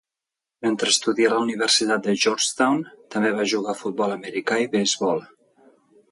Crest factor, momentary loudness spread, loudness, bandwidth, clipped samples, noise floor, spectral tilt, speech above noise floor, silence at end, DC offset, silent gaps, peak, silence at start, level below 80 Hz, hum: 18 dB; 8 LU; -22 LUFS; 11.5 kHz; under 0.1%; -87 dBFS; -2.5 dB/octave; 65 dB; 0.85 s; under 0.1%; none; -6 dBFS; 0.6 s; -70 dBFS; none